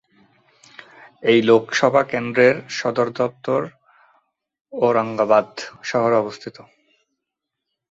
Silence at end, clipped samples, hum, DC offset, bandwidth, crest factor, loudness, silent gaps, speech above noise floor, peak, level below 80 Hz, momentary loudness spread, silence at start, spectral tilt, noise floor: 1.3 s; under 0.1%; none; under 0.1%; 8 kHz; 20 dB; -19 LUFS; 4.61-4.65 s; 63 dB; -2 dBFS; -66 dBFS; 15 LU; 1.2 s; -5 dB/octave; -82 dBFS